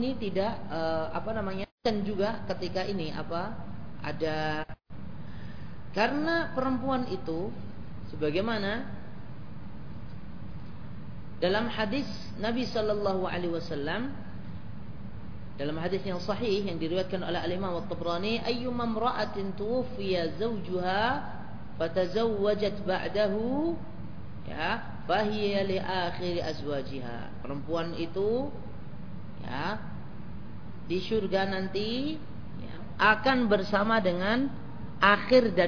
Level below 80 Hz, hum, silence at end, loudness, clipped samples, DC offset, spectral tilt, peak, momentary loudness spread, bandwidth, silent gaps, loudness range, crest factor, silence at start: -52 dBFS; none; 0 s; -30 LUFS; under 0.1%; 1%; -6.5 dB/octave; -6 dBFS; 17 LU; 5.4 kHz; 1.72-1.78 s; 7 LU; 24 dB; 0 s